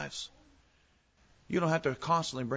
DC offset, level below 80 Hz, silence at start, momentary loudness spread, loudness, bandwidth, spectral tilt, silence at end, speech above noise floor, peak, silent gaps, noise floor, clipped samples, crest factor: under 0.1%; -64 dBFS; 0 s; 12 LU; -32 LUFS; 8 kHz; -5 dB/octave; 0 s; 37 dB; -16 dBFS; none; -68 dBFS; under 0.1%; 18 dB